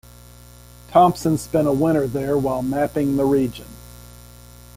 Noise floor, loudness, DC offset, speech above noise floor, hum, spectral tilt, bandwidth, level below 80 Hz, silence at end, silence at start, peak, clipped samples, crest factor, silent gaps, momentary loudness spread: -44 dBFS; -20 LUFS; under 0.1%; 25 dB; 60 Hz at -40 dBFS; -7 dB/octave; 16.5 kHz; -44 dBFS; 0.65 s; 0.9 s; -2 dBFS; under 0.1%; 20 dB; none; 10 LU